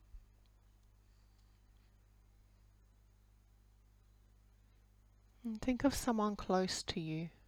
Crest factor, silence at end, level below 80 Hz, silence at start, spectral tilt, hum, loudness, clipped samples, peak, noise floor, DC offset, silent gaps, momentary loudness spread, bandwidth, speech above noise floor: 22 dB; 0.2 s; -60 dBFS; 0.15 s; -5 dB/octave; 50 Hz at -65 dBFS; -38 LUFS; under 0.1%; -20 dBFS; -66 dBFS; under 0.1%; none; 9 LU; 18.5 kHz; 29 dB